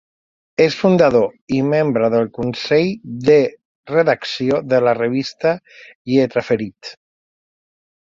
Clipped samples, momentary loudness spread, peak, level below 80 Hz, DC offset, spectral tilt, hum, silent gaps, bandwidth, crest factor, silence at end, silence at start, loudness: under 0.1%; 9 LU; -2 dBFS; -56 dBFS; under 0.1%; -6.5 dB/octave; none; 1.41-1.47 s, 3.65-3.83 s, 5.95-6.05 s; 7.6 kHz; 16 dB; 1.25 s; 0.6 s; -17 LUFS